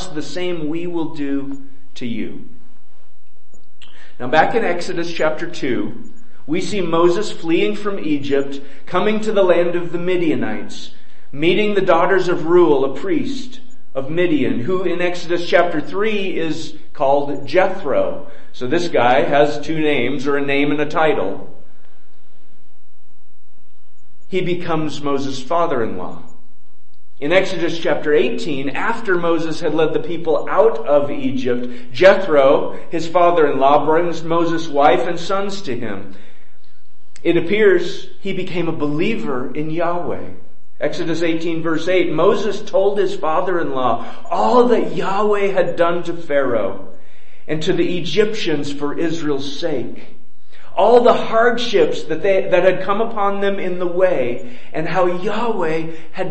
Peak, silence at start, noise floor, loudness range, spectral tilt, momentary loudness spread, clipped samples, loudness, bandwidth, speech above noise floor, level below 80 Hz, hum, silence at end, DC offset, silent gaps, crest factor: 0 dBFS; 0 s; -61 dBFS; 7 LU; -5.5 dB/octave; 12 LU; under 0.1%; -18 LUFS; 8.6 kHz; 43 dB; -56 dBFS; none; 0 s; 10%; none; 20 dB